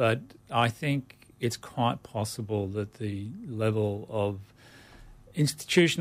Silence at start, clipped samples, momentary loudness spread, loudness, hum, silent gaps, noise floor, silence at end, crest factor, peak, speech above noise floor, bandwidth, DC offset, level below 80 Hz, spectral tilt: 0 s; under 0.1%; 10 LU; -30 LUFS; none; none; -52 dBFS; 0 s; 18 dB; -12 dBFS; 23 dB; 15.5 kHz; under 0.1%; -60 dBFS; -5.5 dB/octave